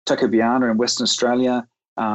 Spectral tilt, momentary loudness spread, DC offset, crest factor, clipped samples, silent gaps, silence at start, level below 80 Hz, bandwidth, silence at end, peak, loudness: -3.5 dB/octave; 8 LU; under 0.1%; 12 dB; under 0.1%; 1.88-1.96 s; 0.05 s; -64 dBFS; 8.6 kHz; 0 s; -8 dBFS; -19 LUFS